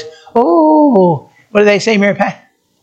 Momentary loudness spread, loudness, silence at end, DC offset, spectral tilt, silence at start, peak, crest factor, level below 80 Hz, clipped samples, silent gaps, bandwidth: 9 LU; -11 LUFS; 0.5 s; under 0.1%; -6 dB/octave; 0 s; 0 dBFS; 12 dB; -56 dBFS; under 0.1%; none; 8.6 kHz